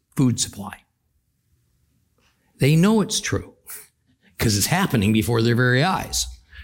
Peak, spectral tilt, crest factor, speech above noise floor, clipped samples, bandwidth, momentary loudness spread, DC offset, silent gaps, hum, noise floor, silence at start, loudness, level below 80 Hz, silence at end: -4 dBFS; -4.5 dB/octave; 18 dB; 49 dB; under 0.1%; 17 kHz; 19 LU; under 0.1%; none; none; -69 dBFS; 0.15 s; -20 LUFS; -46 dBFS; 0 s